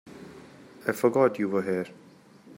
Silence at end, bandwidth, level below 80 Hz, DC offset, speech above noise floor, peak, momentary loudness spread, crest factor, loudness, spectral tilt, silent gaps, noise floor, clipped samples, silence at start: 0.05 s; 16 kHz; -72 dBFS; under 0.1%; 27 dB; -8 dBFS; 23 LU; 20 dB; -26 LUFS; -6.5 dB/octave; none; -53 dBFS; under 0.1%; 0.05 s